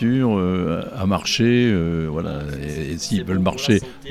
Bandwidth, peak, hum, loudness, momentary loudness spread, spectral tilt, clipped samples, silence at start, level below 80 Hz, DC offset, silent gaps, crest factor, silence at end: 14.5 kHz; -4 dBFS; none; -21 LUFS; 10 LU; -5.5 dB/octave; under 0.1%; 0 s; -40 dBFS; under 0.1%; none; 16 dB; 0 s